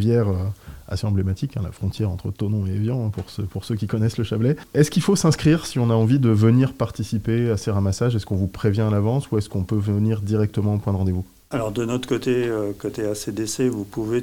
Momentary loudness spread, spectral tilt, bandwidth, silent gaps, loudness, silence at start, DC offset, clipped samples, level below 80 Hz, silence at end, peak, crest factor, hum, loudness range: 10 LU; -7 dB/octave; 16 kHz; none; -22 LUFS; 0 s; 0.1%; under 0.1%; -48 dBFS; 0 s; -4 dBFS; 16 dB; none; 6 LU